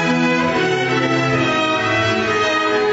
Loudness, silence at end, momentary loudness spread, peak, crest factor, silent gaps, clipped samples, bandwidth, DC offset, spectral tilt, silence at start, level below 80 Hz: -16 LUFS; 0 s; 1 LU; -6 dBFS; 10 dB; none; under 0.1%; 8 kHz; under 0.1%; -5 dB/octave; 0 s; -50 dBFS